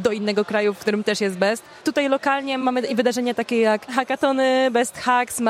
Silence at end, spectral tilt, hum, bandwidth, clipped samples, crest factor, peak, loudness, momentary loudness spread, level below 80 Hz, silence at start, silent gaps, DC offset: 0 s; -4 dB/octave; none; 16 kHz; under 0.1%; 16 dB; -4 dBFS; -21 LUFS; 4 LU; -66 dBFS; 0 s; none; under 0.1%